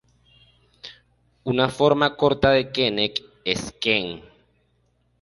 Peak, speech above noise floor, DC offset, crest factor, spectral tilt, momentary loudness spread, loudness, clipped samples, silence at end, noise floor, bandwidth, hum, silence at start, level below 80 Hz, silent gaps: -4 dBFS; 45 dB; under 0.1%; 20 dB; -5 dB/octave; 22 LU; -21 LUFS; under 0.1%; 1.05 s; -66 dBFS; 11.5 kHz; none; 0.85 s; -50 dBFS; none